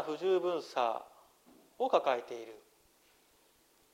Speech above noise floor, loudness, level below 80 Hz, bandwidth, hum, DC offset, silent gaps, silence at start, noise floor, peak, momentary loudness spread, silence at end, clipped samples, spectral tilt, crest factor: 35 dB; -34 LUFS; -82 dBFS; 16 kHz; none; under 0.1%; none; 0 s; -68 dBFS; -14 dBFS; 15 LU; 1.35 s; under 0.1%; -4.5 dB/octave; 22 dB